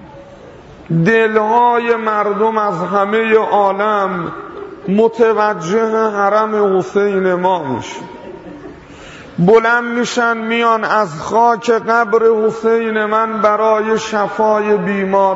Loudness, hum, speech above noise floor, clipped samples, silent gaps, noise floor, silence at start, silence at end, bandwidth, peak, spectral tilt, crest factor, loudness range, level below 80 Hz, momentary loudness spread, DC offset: -14 LUFS; none; 23 dB; under 0.1%; none; -37 dBFS; 0 s; 0 s; 8 kHz; 0 dBFS; -6 dB/octave; 14 dB; 3 LU; -52 dBFS; 15 LU; under 0.1%